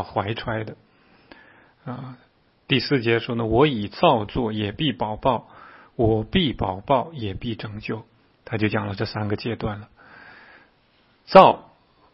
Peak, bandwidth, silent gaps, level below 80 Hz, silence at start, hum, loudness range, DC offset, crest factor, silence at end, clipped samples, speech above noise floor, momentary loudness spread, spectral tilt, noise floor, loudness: 0 dBFS; 5.8 kHz; none; -46 dBFS; 0 s; none; 7 LU; under 0.1%; 24 dB; 0.5 s; under 0.1%; 39 dB; 17 LU; -8.5 dB/octave; -60 dBFS; -22 LUFS